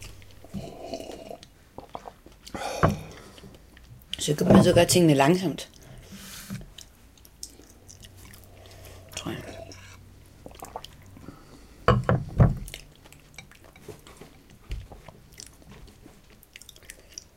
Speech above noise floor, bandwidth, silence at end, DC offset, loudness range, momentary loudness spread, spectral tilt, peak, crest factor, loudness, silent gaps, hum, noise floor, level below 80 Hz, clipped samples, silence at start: 34 dB; 16.5 kHz; 1.5 s; under 0.1%; 23 LU; 29 LU; -5.5 dB/octave; -2 dBFS; 26 dB; -24 LUFS; none; none; -53 dBFS; -44 dBFS; under 0.1%; 0 s